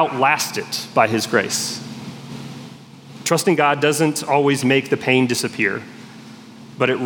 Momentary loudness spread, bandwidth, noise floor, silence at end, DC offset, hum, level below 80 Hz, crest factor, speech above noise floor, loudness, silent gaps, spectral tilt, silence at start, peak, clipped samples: 20 LU; 18 kHz; -40 dBFS; 0 s; under 0.1%; none; -70 dBFS; 18 dB; 21 dB; -18 LUFS; none; -4 dB/octave; 0 s; 0 dBFS; under 0.1%